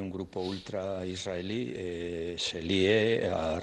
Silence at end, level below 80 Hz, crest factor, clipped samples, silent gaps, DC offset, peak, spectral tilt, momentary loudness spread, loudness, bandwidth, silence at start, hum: 0 s; -60 dBFS; 20 dB; under 0.1%; none; under 0.1%; -12 dBFS; -5 dB/octave; 11 LU; -31 LUFS; 10.5 kHz; 0 s; none